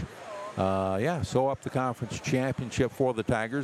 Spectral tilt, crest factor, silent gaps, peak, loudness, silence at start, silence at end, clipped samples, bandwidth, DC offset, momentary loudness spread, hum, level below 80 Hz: -6 dB/octave; 18 dB; none; -12 dBFS; -29 LUFS; 0 s; 0 s; under 0.1%; 14 kHz; under 0.1%; 6 LU; none; -52 dBFS